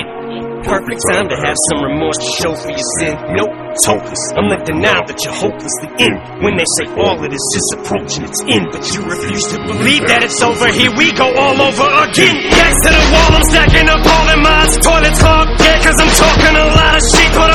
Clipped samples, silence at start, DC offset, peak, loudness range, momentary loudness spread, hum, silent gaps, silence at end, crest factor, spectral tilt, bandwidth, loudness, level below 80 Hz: 0.7%; 0 s; under 0.1%; 0 dBFS; 7 LU; 10 LU; none; none; 0 s; 10 dB; -3 dB/octave; 16.5 kHz; -10 LUFS; -18 dBFS